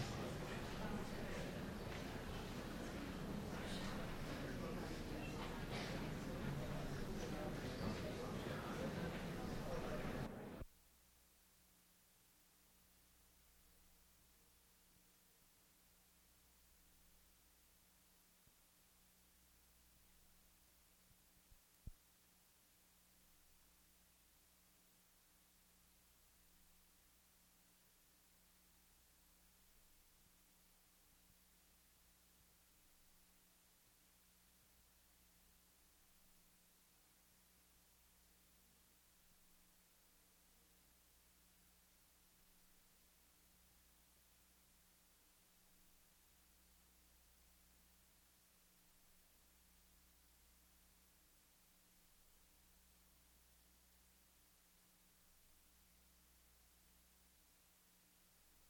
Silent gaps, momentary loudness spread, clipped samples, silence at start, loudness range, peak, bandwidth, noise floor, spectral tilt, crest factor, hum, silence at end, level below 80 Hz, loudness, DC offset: none; 3 LU; under 0.1%; 0 s; 21 LU; -32 dBFS; over 20 kHz; -73 dBFS; -5.5 dB/octave; 22 dB; 60 Hz at -80 dBFS; 0 s; -62 dBFS; -48 LUFS; under 0.1%